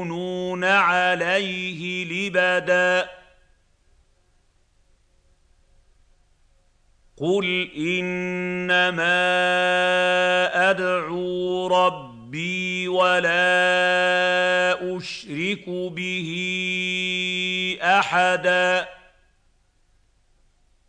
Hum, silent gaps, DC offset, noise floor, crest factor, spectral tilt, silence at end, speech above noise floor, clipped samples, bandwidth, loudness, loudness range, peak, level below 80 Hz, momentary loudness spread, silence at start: none; none; under 0.1%; -62 dBFS; 18 dB; -4 dB/octave; 1.95 s; 41 dB; under 0.1%; 9.8 kHz; -21 LUFS; 7 LU; -6 dBFS; -62 dBFS; 9 LU; 0 s